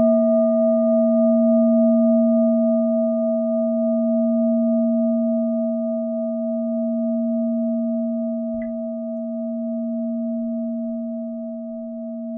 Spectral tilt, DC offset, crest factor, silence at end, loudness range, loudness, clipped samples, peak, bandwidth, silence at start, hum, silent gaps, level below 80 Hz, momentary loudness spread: -15.5 dB/octave; under 0.1%; 12 dB; 0 s; 9 LU; -21 LUFS; under 0.1%; -8 dBFS; 2.1 kHz; 0 s; none; none; -66 dBFS; 11 LU